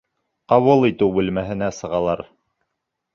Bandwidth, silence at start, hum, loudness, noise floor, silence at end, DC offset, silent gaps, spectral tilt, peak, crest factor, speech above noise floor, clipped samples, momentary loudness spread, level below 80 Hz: 7.4 kHz; 0.5 s; none; -19 LUFS; -78 dBFS; 0.9 s; under 0.1%; none; -7 dB/octave; -2 dBFS; 18 dB; 60 dB; under 0.1%; 10 LU; -50 dBFS